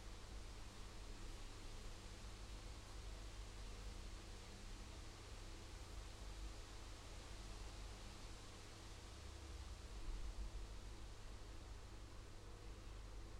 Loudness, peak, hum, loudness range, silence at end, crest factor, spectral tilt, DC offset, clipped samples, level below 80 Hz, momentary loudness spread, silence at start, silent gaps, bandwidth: -57 LUFS; -38 dBFS; none; 1 LU; 0 s; 16 dB; -4 dB/octave; under 0.1%; under 0.1%; -54 dBFS; 3 LU; 0 s; none; 15.5 kHz